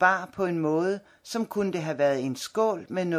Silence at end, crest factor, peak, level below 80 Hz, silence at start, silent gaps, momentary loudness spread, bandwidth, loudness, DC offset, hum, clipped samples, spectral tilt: 0 s; 20 dB; -6 dBFS; -68 dBFS; 0 s; none; 6 LU; 15.5 kHz; -28 LUFS; under 0.1%; none; under 0.1%; -5.5 dB/octave